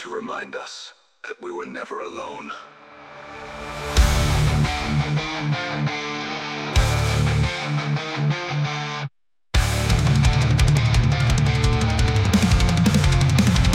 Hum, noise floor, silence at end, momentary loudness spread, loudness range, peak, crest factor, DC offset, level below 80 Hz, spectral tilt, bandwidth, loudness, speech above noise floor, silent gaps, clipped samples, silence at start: none; -42 dBFS; 0 s; 17 LU; 10 LU; -6 dBFS; 16 dB; under 0.1%; -28 dBFS; -5.5 dB/octave; 16 kHz; -21 LUFS; 9 dB; none; under 0.1%; 0 s